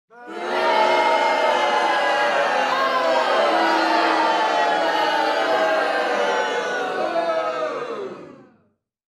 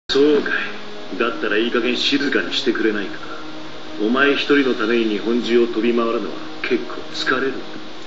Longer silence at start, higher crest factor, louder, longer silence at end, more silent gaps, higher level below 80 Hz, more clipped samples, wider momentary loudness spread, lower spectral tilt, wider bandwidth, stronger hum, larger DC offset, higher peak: about the same, 0.15 s vs 0.1 s; about the same, 14 dB vs 16 dB; about the same, -20 LUFS vs -19 LUFS; first, 0.8 s vs 0 s; neither; second, -74 dBFS vs -60 dBFS; neither; second, 8 LU vs 16 LU; about the same, -2.5 dB/octave vs -1.5 dB/octave; first, 13 kHz vs 7.8 kHz; neither; second, under 0.1% vs 3%; second, -6 dBFS vs -2 dBFS